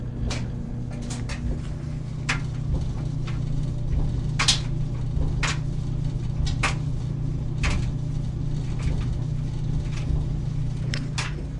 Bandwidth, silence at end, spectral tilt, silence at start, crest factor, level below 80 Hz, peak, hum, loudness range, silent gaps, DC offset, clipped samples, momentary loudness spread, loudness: 11.5 kHz; 0 s; -5 dB/octave; 0 s; 20 dB; -30 dBFS; -4 dBFS; none; 4 LU; none; under 0.1%; under 0.1%; 6 LU; -28 LUFS